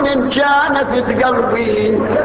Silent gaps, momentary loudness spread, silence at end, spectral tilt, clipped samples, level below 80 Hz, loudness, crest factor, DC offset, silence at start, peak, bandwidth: none; 3 LU; 0 s; -9.5 dB/octave; under 0.1%; -40 dBFS; -14 LUFS; 10 dB; under 0.1%; 0 s; -4 dBFS; 4 kHz